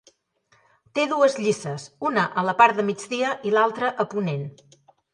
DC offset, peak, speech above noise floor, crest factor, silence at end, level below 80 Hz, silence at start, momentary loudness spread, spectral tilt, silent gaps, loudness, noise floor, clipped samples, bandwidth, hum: under 0.1%; -2 dBFS; 41 dB; 22 dB; 0.65 s; -72 dBFS; 0.95 s; 11 LU; -5 dB/octave; none; -23 LUFS; -64 dBFS; under 0.1%; 11 kHz; none